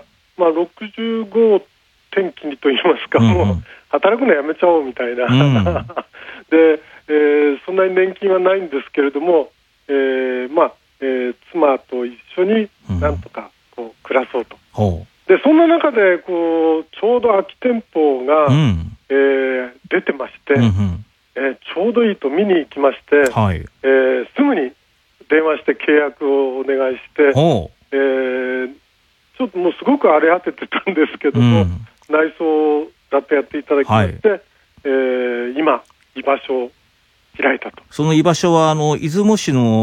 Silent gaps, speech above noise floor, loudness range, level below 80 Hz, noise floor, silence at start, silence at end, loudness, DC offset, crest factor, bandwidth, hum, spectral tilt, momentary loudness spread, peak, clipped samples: none; 42 dB; 4 LU; -48 dBFS; -58 dBFS; 0.4 s; 0 s; -16 LUFS; under 0.1%; 16 dB; 11 kHz; none; -6.5 dB/octave; 11 LU; 0 dBFS; under 0.1%